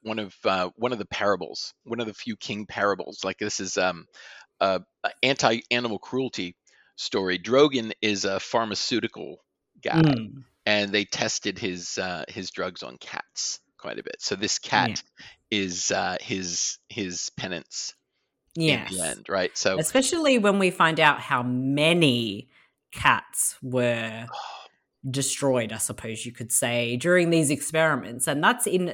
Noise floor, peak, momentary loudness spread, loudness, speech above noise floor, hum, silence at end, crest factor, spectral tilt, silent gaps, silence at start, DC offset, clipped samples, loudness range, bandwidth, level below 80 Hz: -76 dBFS; -2 dBFS; 14 LU; -25 LUFS; 50 dB; none; 0 s; 24 dB; -3.5 dB/octave; none; 0.05 s; under 0.1%; under 0.1%; 6 LU; 17.5 kHz; -64 dBFS